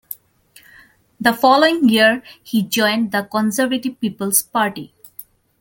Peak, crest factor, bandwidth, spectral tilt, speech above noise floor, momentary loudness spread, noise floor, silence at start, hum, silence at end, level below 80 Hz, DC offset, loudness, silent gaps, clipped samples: 0 dBFS; 18 dB; 17 kHz; -3 dB/octave; 34 dB; 21 LU; -51 dBFS; 0.1 s; none; 0.4 s; -62 dBFS; under 0.1%; -17 LUFS; none; under 0.1%